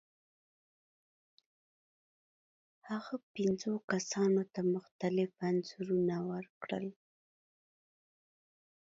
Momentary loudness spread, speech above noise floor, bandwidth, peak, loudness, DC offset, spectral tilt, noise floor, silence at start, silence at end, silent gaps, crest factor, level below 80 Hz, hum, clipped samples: 10 LU; over 55 dB; 7.8 kHz; -18 dBFS; -36 LUFS; under 0.1%; -6 dB/octave; under -90 dBFS; 2.85 s; 2 s; 3.23-3.34 s, 3.84-3.88 s, 4.91-4.99 s, 6.49-6.61 s; 20 dB; -80 dBFS; none; under 0.1%